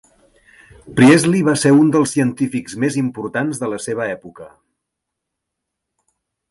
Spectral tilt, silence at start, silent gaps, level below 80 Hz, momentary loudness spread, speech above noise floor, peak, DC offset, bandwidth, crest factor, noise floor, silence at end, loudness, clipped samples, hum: -5.5 dB/octave; 0.85 s; none; -56 dBFS; 13 LU; 64 dB; 0 dBFS; under 0.1%; 11.5 kHz; 18 dB; -79 dBFS; 2.05 s; -16 LUFS; under 0.1%; none